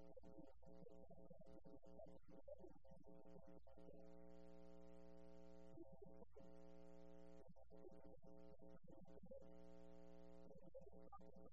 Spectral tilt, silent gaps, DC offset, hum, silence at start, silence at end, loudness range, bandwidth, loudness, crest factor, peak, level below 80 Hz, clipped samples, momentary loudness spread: -8 dB/octave; none; 0.1%; none; 0 s; 0 s; 1 LU; 7.4 kHz; -66 LUFS; 16 dB; -48 dBFS; -74 dBFS; under 0.1%; 3 LU